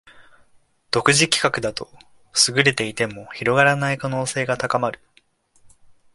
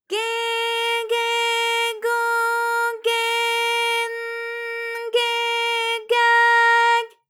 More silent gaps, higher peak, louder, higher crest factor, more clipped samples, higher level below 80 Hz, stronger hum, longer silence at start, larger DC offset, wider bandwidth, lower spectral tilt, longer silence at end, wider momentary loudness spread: neither; first, 0 dBFS vs -6 dBFS; about the same, -19 LUFS vs -20 LUFS; first, 22 dB vs 14 dB; neither; first, -56 dBFS vs under -90 dBFS; neither; about the same, 0.15 s vs 0.1 s; neither; second, 11.5 kHz vs 19.5 kHz; first, -3 dB/octave vs 3.5 dB/octave; first, 1.2 s vs 0.2 s; about the same, 11 LU vs 12 LU